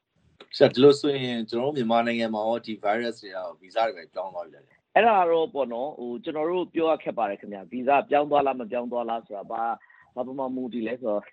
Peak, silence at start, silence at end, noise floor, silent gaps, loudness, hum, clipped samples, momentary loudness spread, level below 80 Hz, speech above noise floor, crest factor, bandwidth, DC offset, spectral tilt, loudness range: -2 dBFS; 0.4 s; 0.05 s; -55 dBFS; none; -25 LUFS; none; under 0.1%; 16 LU; -74 dBFS; 30 dB; 24 dB; 9.2 kHz; under 0.1%; -6 dB/octave; 4 LU